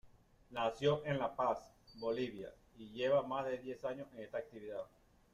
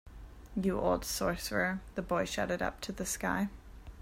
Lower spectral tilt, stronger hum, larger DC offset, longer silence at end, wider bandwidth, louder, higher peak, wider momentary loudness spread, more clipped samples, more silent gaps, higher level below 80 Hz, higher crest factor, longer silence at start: first, -6.5 dB/octave vs -4 dB/octave; neither; neither; first, 0.45 s vs 0 s; second, 11.5 kHz vs 16 kHz; second, -39 LUFS vs -34 LUFS; second, -20 dBFS vs -16 dBFS; first, 17 LU vs 14 LU; neither; neither; second, -70 dBFS vs -50 dBFS; about the same, 20 dB vs 18 dB; about the same, 0.05 s vs 0.05 s